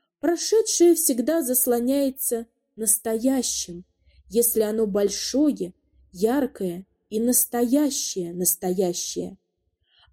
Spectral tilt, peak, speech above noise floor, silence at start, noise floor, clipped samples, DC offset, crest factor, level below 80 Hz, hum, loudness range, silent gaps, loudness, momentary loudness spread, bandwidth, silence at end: -3.5 dB/octave; -6 dBFS; 50 dB; 0.25 s; -73 dBFS; under 0.1%; under 0.1%; 18 dB; -58 dBFS; none; 3 LU; none; -22 LUFS; 11 LU; 17 kHz; 0.8 s